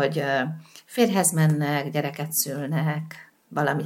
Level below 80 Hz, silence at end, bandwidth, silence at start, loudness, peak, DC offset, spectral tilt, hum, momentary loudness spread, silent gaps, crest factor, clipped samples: -76 dBFS; 0 s; 17 kHz; 0 s; -24 LUFS; -6 dBFS; under 0.1%; -4.5 dB/octave; none; 13 LU; none; 18 dB; under 0.1%